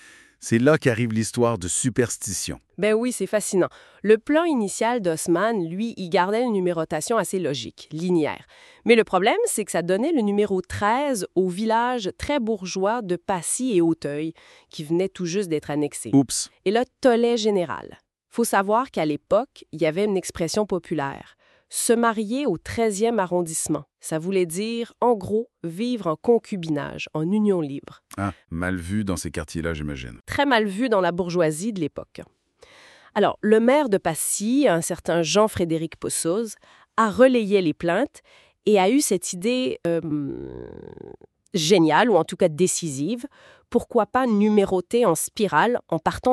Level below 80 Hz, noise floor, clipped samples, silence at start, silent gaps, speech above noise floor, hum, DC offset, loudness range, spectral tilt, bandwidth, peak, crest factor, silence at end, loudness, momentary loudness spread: -52 dBFS; -52 dBFS; under 0.1%; 0.4 s; none; 30 dB; none; under 0.1%; 4 LU; -4.5 dB/octave; 13.5 kHz; -2 dBFS; 20 dB; 0 s; -23 LUFS; 11 LU